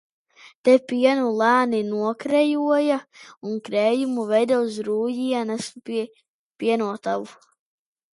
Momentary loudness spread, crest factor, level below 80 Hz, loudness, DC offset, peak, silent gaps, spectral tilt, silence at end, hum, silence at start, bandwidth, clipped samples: 11 LU; 18 dB; -74 dBFS; -22 LUFS; under 0.1%; -4 dBFS; 0.55-0.64 s, 3.37-3.41 s, 6.28-6.59 s; -5 dB/octave; 0.8 s; none; 0.45 s; 11.5 kHz; under 0.1%